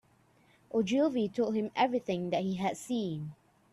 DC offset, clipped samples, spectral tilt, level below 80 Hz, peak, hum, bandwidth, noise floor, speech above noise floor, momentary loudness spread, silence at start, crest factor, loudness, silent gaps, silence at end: under 0.1%; under 0.1%; -6 dB/octave; -70 dBFS; -14 dBFS; none; 12.5 kHz; -66 dBFS; 35 dB; 7 LU; 0.75 s; 18 dB; -32 LUFS; none; 0.4 s